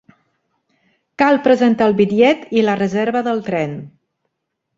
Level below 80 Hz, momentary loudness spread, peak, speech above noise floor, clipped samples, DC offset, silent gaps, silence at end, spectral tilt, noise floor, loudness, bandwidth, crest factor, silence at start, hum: -58 dBFS; 9 LU; -2 dBFS; 60 dB; under 0.1%; under 0.1%; none; 0.9 s; -6.5 dB/octave; -75 dBFS; -16 LUFS; 7.8 kHz; 16 dB; 1.2 s; none